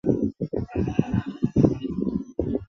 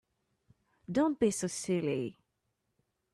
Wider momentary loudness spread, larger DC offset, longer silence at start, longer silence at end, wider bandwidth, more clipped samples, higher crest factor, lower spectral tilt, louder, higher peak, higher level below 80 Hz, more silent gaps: about the same, 7 LU vs 7 LU; neither; second, 0.05 s vs 0.9 s; second, 0.05 s vs 1 s; second, 6.8 kHz vs 13 kHz; neither; about the same, 22 dB vs 18 dB; first, -9.5 dB/octave vs -5.5 dB/octave; first, -26 LUFS vs -32 LUFS; first, -4 dBFS vs -16 dBFS; first, -42 dBFS vs -70 dBFS; neither